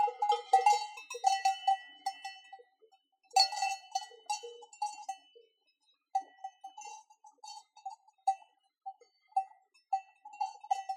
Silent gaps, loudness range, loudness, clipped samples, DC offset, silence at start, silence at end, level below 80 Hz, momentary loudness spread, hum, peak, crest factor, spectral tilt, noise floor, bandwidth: none; 12 LU; -34 LUFS; under 0.1%; under 0.1%; 0 s; 0 s; under -90 dBFS; 22 LU; none; -12 dBFS; 22 dB; 5.5 dB/octave; -75 dBFS; 14.5 kHz